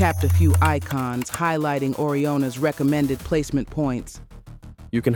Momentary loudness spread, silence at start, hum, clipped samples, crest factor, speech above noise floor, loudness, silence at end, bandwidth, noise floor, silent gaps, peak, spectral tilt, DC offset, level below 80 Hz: 8 LU; 0 s; none; under 0.1%; 16 dB; 20 dB; -22 LUFS; 0 s; 19 kHz; -41 dBFS; none; -6 dBFS; -6.5 dB/octave; under 0.1%; -40 dBFS